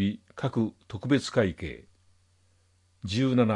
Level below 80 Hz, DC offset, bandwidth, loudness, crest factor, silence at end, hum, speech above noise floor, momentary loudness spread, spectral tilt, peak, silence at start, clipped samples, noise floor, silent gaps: -58 dBFS; under 0.1%; 11 kHz; -29 LUFS; 18 dB; 0 s; none; 39 dB; 15 LU; -6.5 dB/octave; -12 dBFS; 0 s; under 0.1%; -66 dBFS; none